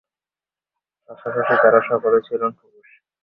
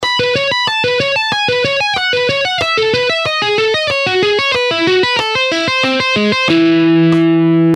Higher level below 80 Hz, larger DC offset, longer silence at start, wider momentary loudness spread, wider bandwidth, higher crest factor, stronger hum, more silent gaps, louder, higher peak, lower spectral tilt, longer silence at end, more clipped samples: second, -70 dBFS vs -50 dBFS; neither; first, 1.1 s vs 0 s; first, 12 LU vs 3 LU; second, 5.2 kHz vs 11 kHz; first, 20 dB vs 12 dB; neither; neither; second, -18 LUFS vs -12 LUFS; about the same, -2 dBFS vs -2 dBFS; first, -9 dB/octave vs -4.5 dB/octave; first, 0.7 s vs 0 s; neither